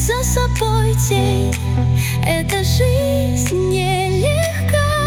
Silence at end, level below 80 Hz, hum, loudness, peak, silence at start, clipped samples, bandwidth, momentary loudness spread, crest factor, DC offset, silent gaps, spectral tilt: 0 s; -26 dBFS; none; -17 LUFS; -4 dBFS; 0 s; under 0.1%; 18 kHz; 2 LU; 12 dB; under 0.1%; none; -5 dB/octave